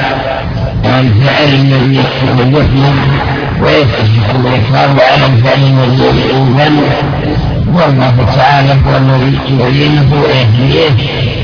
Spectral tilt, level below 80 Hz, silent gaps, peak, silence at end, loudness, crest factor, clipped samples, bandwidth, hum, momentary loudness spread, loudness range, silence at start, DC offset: -7.5 dB/octave; -24 dBFS; none; 0 dBFS; 0 s; -8 LUFS; 8 dB; 0.4%; 5.4 kHz; none; 6 LU; 1 LU; 0 s; under 0.1%